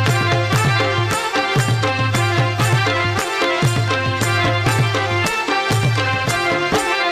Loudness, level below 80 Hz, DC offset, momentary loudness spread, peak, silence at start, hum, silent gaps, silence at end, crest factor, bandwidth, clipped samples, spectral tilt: -17 LUFS; -44 dBFS; under 0.1%; 2 LU; -4 dBFS; 0 s; none; none; 0 s; 12 dB; 15.5 kHz; under 0.1%; -4.5 dB/octave